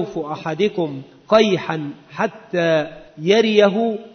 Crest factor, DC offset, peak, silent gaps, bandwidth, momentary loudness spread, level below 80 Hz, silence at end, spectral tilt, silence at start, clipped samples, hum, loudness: 18 dB; under 0.1%; -2 dBFS; none; 6.6 kHz; 12 LU; -58 dBFS; 0.05 s; -5.5 dB/octave; 0 s; under 0.1%; none; -19 LUFS